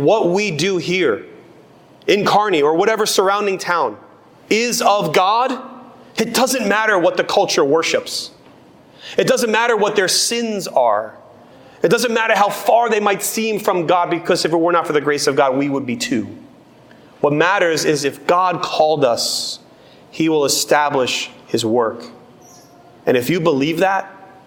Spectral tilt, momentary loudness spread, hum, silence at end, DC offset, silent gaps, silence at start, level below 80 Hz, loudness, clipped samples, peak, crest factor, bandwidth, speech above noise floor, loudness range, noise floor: -3.5 dB/octave; 8 LU; none; 0.2 s; under 0.1%; none; 0 s; -62 dBFS; -16 LUFS; under 0.1%; 0 dBFS; 16 dB; 18 kHz; 29 dB; 2 LU; -46 dBFS